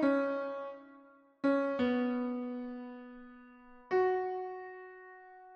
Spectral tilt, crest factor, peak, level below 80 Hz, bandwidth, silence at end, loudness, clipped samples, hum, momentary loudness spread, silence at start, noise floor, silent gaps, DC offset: -7 dB/octave; 16 dB; -18 dBFS; -72 dBFS; 6.6 kHz; 0 s; -34 LUFS; under 0.1%; none; 21 LU; 0 s; -60 dBFS; none; under 0.1%